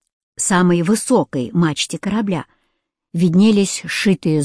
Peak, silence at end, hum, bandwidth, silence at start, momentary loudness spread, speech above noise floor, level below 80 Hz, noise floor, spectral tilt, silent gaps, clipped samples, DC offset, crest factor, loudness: -4 dBFS; 0 s; none; 11 kHz; 0.4 s; 9 LU; 55 dB; -54 dBFS; -71 dBFS; -5 dB/octave; none; under 0.1%; under 0.1%; 14 dB; -17 LUFS